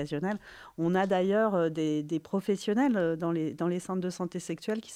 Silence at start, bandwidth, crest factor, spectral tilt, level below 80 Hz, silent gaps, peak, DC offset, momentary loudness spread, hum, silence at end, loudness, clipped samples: 0 s; 14.5 kHz; 14 dB; -6.5 dB/octave; -66 dBFS; none; -14 dBFS; under 0.1%; 9 LU; none; 0 s; -30 LUFS; under 0.1%